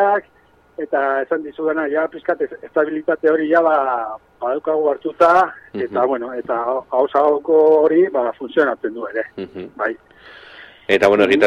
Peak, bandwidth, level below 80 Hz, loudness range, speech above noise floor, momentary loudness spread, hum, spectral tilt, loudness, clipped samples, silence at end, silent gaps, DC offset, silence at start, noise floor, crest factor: -2 dBFS; 9.6 kHz; -60 dBFS; 4 LU; 25 dB; 13 LU; none; -5.5 dB/octave; -18 LUFS; under 0.1%; 0 s; none; under 0.1%; 0 s; -42 dBFS; 16 dB